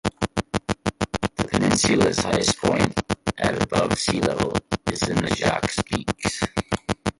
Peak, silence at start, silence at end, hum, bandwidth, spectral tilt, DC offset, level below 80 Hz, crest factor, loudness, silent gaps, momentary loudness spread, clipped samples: -2 dBFS; 0.05 s; 0.1 s; none; 11.5 kHz; -4 dB/octave; under 0.1%; -42 dBFS; 20 dB; -23 LUFS; none; 8 LU; under 0.1%